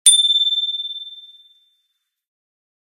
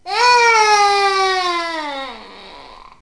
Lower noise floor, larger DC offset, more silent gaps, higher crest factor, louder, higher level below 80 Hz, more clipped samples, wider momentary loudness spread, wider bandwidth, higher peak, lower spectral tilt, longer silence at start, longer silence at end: first, -72 dBFS vs -39 dBFS; second, under 0.1% vs 0.3%; neither; about the same, 20 dB vs 16 dB; about the same, -15 LUFS vs -14 LUFS; second, -82 dBFS vs -52 dBFS; neither; about the same, 19 LU vs 17 LU; first, 15.5 kHz vs 10.5 kHz; about the same, 0 dBFS vs -2 dBFS; second, 8 dB/octave vs 0 dB/octave; about the same, 0.05 s vs 0.05 s; first, 1.7 s vs 0.2 s